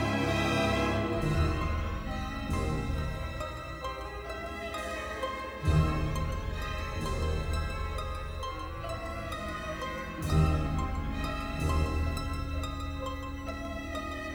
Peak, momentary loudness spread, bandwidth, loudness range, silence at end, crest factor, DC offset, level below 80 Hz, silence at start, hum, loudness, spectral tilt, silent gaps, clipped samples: -14 dBFS; 10 LU; 19.5 kHz; 4 LU; 0 s; 18 dB; under 0.1%; -36 dBFS; 0 s; none; -33 LUFS; -6 dB/octave; none; under 0.1%